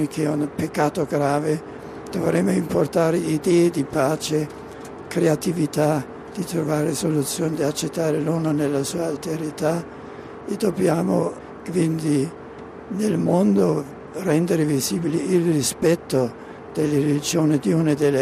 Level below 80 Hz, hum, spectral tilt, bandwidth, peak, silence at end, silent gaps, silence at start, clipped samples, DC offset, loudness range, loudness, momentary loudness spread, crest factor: -56 dBFS; none; -6 dB/octave; 14.5 kHz; -6 dBFS; 0 s; none; 0 s; under 0.1%; under 0.1%; 3 LU; -22 LUFS; 12 LU; 16 dB